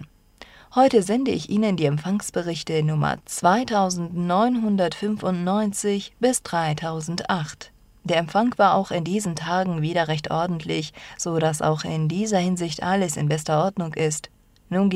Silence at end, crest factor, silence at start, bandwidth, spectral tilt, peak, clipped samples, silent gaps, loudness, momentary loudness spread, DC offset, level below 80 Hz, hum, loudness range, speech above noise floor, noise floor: 0 s; 18 dB; 0 s; 15 kHz; -5.5 dB/octave; -4 dBFS; under 0.1%; none; -23 LUFS; 8 LU; under 0.1%; -56 dBFS; none; 2 LU; 26 dB; -49 dBFS